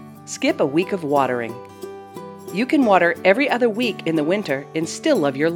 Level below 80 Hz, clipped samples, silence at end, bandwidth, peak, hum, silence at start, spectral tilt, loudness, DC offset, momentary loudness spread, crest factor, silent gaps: -70 dBFS; under 0.1%; 0 s; 19 kHz; 0 dBFS; none; 0 s; -5 dB/octave; -19 LUFS; under 0.1%; 19 LU; 20 dB; none